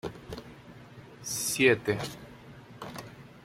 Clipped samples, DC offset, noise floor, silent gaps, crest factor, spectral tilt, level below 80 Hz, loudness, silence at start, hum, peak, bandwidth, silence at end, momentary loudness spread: under 0.1%; under 0.1%; -50 dBFS; none; 24 dB; -3.5 dB/octave; -60 dBFS; -28 LUFS; 0.05 s; none; -10 dBFS; 16.5 kHz; 0.05 s; 26 LU